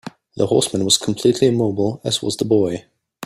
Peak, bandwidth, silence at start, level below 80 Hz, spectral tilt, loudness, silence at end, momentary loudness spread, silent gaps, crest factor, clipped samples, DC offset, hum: -2 dBFS; 15.5 kHz; 0.05 s; -54 dBFS; -4.5 dB/octave; -18 LUFS; 0 s; 8 LU; none; 18 dB; under 0.1%; under 0.1%; none